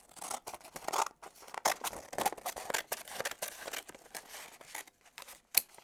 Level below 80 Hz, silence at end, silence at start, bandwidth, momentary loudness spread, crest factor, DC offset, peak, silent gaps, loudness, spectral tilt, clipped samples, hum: -72 dBFS; 0 s; 0.15 s; over 20 kHz; 15 LU; 36 dB; under 0.1%; -4 dBFS; none; -38 LUFS; 0 dB/octave; under 0.1%; none